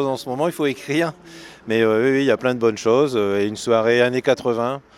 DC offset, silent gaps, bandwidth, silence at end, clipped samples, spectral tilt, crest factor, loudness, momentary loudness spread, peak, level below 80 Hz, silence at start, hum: under 0.1%; none; 14 kHz; 0.2 s; under 0.1%; -5.5 dB/octave; 16 dB; -19 LUFS; 7 LU; -2 dBFS; -62 dBFS; 0 s; none